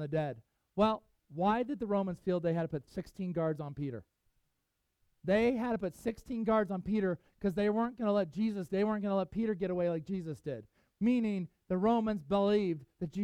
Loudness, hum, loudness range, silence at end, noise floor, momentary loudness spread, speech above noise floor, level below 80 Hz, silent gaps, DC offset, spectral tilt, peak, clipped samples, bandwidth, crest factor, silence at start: -34 LUFS; none; 3 LU; 0 s; -82 dBFS; 11 LU; 49 dB; -62 dBFS; none; under 0.1%; -8 dB/octave; -16 dBFS; under 0.1%; 12 kHz; 18 dB; 0 s